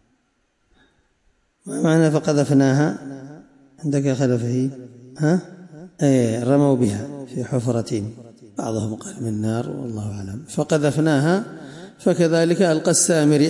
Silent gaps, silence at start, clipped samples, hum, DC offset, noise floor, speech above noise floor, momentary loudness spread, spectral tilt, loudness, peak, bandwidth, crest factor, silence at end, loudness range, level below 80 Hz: none; 1.65 s; under 0.1%; none; under 0.1%; -67 dBFS; 48 dB; 18 LU; -6 dB/octave; -20 LUFS; -6 dBFS; 11.5 kHz; 16 dB; 0 s; 5 LU; -60 dBFS